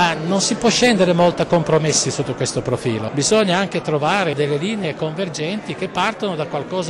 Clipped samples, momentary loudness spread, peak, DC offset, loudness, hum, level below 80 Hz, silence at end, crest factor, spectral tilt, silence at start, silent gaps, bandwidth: under 0.1%; 9 LU; -6 dBFS; under 0.1%; -18 LUFS; none; -50 dBFS; 0 s; 12 dB; -4 dB/octave; 0 s; none; 12.5 kHz